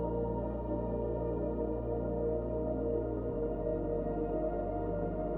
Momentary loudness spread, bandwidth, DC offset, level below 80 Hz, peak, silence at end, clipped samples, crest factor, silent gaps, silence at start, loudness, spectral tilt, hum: 2 LU; 3.2 kHz; under 0.1%; -42 dBFS; -22 dBFS; 0 s; under 0.1%; 12 dB; none; 0 s; -35 LUFS; -12.5 dB/octave; none